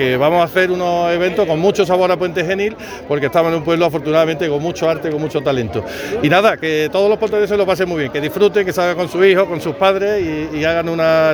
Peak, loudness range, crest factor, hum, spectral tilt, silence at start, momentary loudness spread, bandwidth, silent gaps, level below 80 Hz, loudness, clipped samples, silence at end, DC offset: 0 dBFS; 2 LU; 14 dB; none; -5.5 dB/octave; 0 s; 6 LU; over 20 kHz; none; -46 dBFS; -16 LUFS; under 0.1%; 0 s; under 0.1%